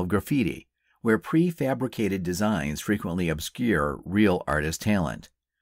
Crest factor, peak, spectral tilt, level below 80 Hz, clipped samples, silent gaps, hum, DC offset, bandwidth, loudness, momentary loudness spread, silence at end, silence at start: 16 dB; -10 dBFS; -6 dB/octave; -46 dBFS; under 0.1%; none; none; under 0.1%; 16 kHz; -26 LUFS; 6 LU; 0.35 s; 0 s